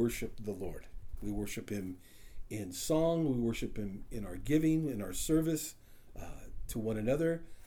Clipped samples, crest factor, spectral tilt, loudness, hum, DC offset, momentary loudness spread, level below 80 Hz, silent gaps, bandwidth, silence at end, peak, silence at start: under 0.1%; 18 dB; -6 dB/octave; -35 LUFS; none; under 0.1%; 19 LU; -48 dBFS; none; 20 kHz; 0 s; -18 dBFS; 0 s